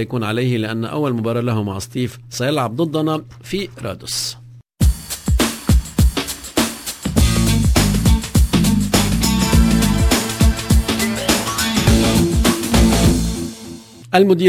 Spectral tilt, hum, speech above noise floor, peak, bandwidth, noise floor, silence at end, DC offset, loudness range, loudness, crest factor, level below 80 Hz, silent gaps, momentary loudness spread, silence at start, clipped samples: -5 dB/octave; none; 17 dB; 0 dBFS; 16 kHz; -35 dBFS; 0 s; under 0.1%; 6 LU; -17 LUFS; 16 dB; -22 dBFS; none; 11 LU; 0 s; under 0.1%